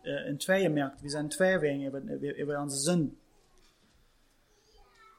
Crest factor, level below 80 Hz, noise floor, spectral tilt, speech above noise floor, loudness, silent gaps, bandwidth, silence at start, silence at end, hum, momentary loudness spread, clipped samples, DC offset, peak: 18 dB; -64 dBFS; -66 dBFS; -4.5 dB/octave; 36 dB; -31 LUFS; none; 16.5 kHz; 0.05 s; 2.05 s; none; 10 LU; under 0.1%; under 0.1%; -14 dBFS